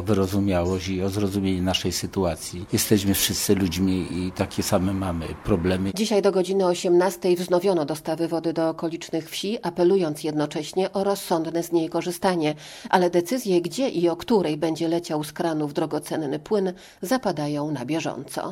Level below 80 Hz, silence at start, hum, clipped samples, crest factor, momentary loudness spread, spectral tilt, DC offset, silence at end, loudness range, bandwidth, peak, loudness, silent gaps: -50 dBFS; 0 s; none; under 0.1%; 20 dB; 7 LU; -5 dB/octave; under 0.1%; 0 s; 3 LU; 17 kHz; -4 dBFS; -24 LUFS; none